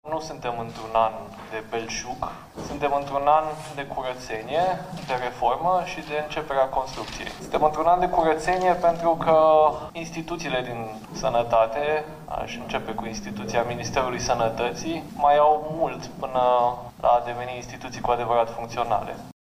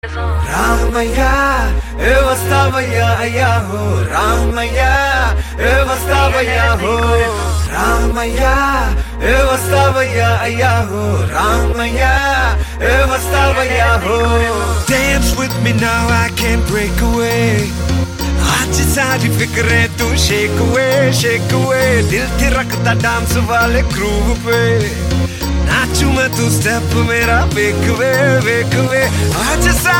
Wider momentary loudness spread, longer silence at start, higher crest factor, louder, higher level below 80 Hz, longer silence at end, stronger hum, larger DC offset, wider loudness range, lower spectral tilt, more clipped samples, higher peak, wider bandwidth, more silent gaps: first, 13 LU vs 4 LU; about the same, 0.05 s vs 0.05 s; first, 20 dB vs 12 dB; second, -24 LUFS vs -13 LUFS; second, -48 dBFS vs -20 dBFS; first, 0.25 s vs 0 s; neither; neither; first, 6 LU vs 1 LU; about the same, -4.5 dB/octave vs -4.5 dB/octave; neither; second, -4 dBFS vs 0 dBFS; about the same, 15.5 kHz vs 17 kHz; neither